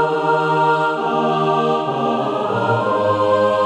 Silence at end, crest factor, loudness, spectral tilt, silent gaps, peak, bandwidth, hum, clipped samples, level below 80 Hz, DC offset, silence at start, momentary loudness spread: 0 s; 12 dB; -17 LUFS; -6.5 dB/octave; none; -4 dBFS; 10.5 kHz; none; under 0.1%; -64 dBFS; under 0.1%; 0 s; 4 LU